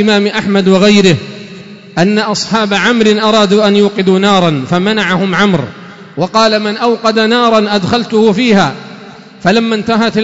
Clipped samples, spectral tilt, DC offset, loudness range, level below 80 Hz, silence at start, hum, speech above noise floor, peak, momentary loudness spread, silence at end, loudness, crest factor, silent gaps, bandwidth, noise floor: under 0.1%; -5 dB/octave; 0.4%; 2 LU; -48 dBFS; 0 s; none; 23 dB; 0 dBFS; 8 LU; 0 s; -10 LUFS; 10 dB; none; 8 kHz; -32 dBFS